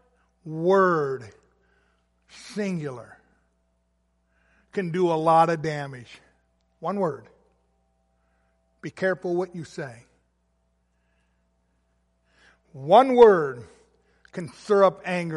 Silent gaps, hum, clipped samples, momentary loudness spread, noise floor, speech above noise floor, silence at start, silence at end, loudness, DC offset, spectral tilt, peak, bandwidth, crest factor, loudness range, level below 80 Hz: none; none; under 0.1%; 22 LU; -70 dBFS; 48 dB; 0.45 s; 0 s; -22 LUFS; under 0.1%; -6.5 dB/octave; -4 dBFS; 11.5 kHz; 22 dB; 14 LU; -66 dBFS